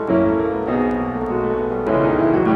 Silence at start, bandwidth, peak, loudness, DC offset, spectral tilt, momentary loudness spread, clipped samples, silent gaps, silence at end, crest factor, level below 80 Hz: 0 s; 5 kHz; -4 dBFS; -19 LUFS; under 0.1%; -9.5 dB/octave; 5 LU; under 0.1%; none; 0 s; 14 dB; -40 dBFS